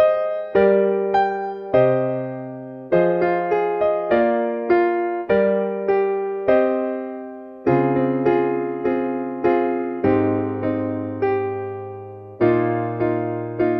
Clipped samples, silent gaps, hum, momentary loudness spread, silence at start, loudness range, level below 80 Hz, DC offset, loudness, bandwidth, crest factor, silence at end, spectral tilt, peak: under 0.1%; none; none; 10 LU; 0 s; 3 LU; -56 dBFS; under 0.1%; -20 LUFS; 5.6 kHz; 16 dB; 0 s; -10 dB/octave; -4 dBFS